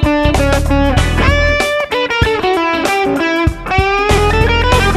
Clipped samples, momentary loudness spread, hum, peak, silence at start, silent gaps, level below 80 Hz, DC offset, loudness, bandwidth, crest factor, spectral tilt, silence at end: under 0.1%; 3 LU; none; 0 dBFS; 0 s; none; -18 dBFS; under 0.1%; -13 LUFS; 13.5 kHz; 12 dB; -5.5 dB/octave; 0 s